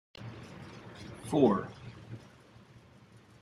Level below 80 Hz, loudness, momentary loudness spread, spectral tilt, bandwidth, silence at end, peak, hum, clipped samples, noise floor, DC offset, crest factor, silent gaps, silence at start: -66 dBFS; -29 LUFS; 22 LU; -7.5 dB/octave; 12.5 kHz; 1.25 s; -12 dBFS; none; under 0.1%; -58 dBFS; under 0.1%; 24 dB; none; 0.15 s